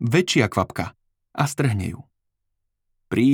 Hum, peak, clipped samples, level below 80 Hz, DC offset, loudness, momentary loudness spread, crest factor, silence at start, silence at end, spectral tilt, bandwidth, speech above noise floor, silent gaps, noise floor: none; -4 dBFS; under 0.1%; -56 dBFS; under 0.1%; -23 LUFS; 14 LU; 20 dB; 0 s; 0 s; -5.5 dB/octave; 19 kHz; 54 dB; none; -76 dBFS